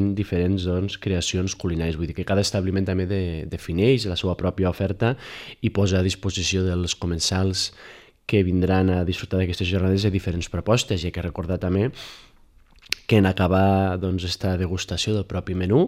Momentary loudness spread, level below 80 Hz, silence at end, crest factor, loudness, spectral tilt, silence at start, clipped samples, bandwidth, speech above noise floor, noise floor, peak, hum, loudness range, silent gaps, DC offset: 8 LU; -42 dBFS; 0 s; 22 dB; -23 LUFS; -5.5 dB/octave; 0 s; under 0.1%; 13.5 kHz; 30 dB; -53 dBFS; 0 dBFS; none; 2 LU; none; under 0.1%